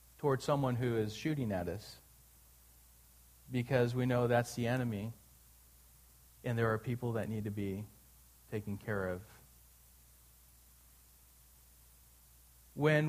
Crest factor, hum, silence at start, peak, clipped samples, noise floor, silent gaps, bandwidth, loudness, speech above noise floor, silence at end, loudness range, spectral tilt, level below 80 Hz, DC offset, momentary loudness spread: 22 dB; none; 0.2 s; -16 dBFS; under 0.1%; -63 dBFS; none; 15.5 kHz; -36 LUFS; 28 dB; 0 s; 9 LU; -6.5 dB/octave; -64 dBFS; under 0.1%; 14 LU